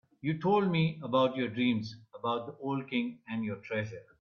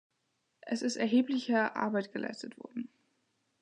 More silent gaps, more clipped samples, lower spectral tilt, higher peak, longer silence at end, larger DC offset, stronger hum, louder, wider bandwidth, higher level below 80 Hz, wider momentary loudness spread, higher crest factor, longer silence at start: neither; neither; first, -8 dB/octave vs -4.5 dB/octave; about the same, -14 dBFS vs -16 dBFS; second, 0.2 s vs 0.75 s; neither; neither; about the same, -32 LUFS vs -33 LUFS; second, 6.8 kHz vs 10 kHz; first, -72 dBFS vs -86 dBFS; second, 9 LU vs 15 LU; about the same, 18 dB vs 20 dB; second, 0.25 s vs 0.65 s